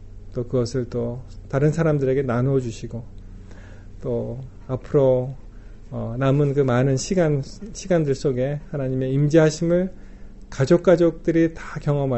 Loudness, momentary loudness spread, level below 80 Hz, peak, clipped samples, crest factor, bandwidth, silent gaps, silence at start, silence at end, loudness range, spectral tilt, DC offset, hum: -21 LUFS; 16 LU; -40 dBFS; -4 dBFS; under 0.1%; 18 dB; 8.2 kHz; none; 0 s; 0 s; 5 LU; -7.5 dB/octave; under 0.1%; none